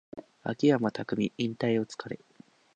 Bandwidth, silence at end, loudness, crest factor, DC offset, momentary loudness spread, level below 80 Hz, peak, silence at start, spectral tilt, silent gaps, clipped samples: 9.2 kHz; 0.6 s; -30 LUFS; 20 dB; under 0.1%; 17 LU; -70 dBFS; -12 dBFS; 0.15 s; -6.5 dB/octave; none; under 0.1%